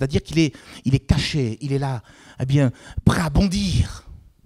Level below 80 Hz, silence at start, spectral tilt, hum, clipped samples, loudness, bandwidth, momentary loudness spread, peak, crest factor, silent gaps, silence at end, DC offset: -32 dBFS; 0 s; -6 dB/octave; none; under 0.1%; -22 LUFS; 13 kHz; 8 LU; 0 dBFS; 20 dB; none; 0.3 s; under 0.1%